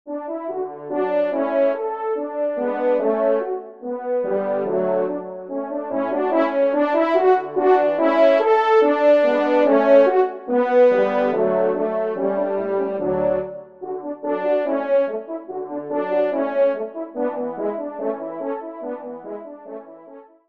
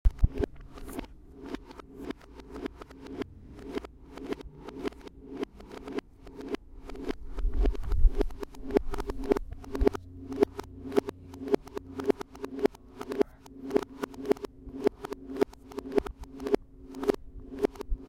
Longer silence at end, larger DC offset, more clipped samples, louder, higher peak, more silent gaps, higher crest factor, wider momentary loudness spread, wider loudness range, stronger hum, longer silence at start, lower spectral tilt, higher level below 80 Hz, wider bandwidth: first, 0.25 s vs 0 s; first, 0.1% vs under 0.1%; neither; first, -20 LUFS vs -34 LUFS; first, -2 dBFS vs -6 dBFS; neither; second, 18 dB vs 26 dB; about the same, 14 LU vs 15 LU; about the same, 8 LU vs 10 LU; neither; about the same, 0.05 s vs 0.05 s; about the same, -7.5 dB/octave vs -7 dB/octave; second, -64 dBFS vs -36 dBFS; second, 6 kHz vs 15.5 kHz